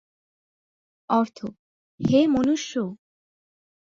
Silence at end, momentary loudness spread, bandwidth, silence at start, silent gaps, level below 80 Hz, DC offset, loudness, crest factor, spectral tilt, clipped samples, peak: 1 s; 15 LU; 7.6 kHz; 1.1 s; 1.59-1.98 s; -58 dBFS; under 0.1%; -23 LUFS; 18 dB; -6 dB/octave; under 0.1%; -8 dBFS